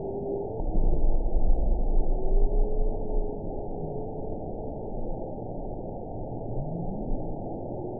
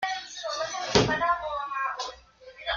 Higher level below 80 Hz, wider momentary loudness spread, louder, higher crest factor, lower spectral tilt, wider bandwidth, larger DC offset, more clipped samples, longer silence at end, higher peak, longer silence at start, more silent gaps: first, -28 dBFS vs -52 dBFS; second, 7 LU vs 12 LU; second, -33 LUFS vs -28 LUFS; second, 16 dB vs 26 dB; first, -17 dB/octave vs -3.5 dB/octave; second, 1 kHz vs 7.6 kHz; first, 0.7% vs under 0.1%; neither; about the same, 0 s vs 0 s; second, -10 dBFS vs -2 dBFS; about the same, 0 s vs 0 s; neither